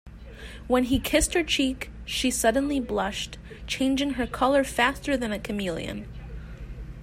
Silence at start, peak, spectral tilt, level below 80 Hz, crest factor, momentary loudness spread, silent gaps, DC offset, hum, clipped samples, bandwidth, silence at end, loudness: 0.05 s; -8 dBFS; -3.5 dB/octave; -40 dBFS; 20 dB; 18 LU; none; under 0.1%; none; under 0.1%; 16 kHz; 0 s; -26 LUFS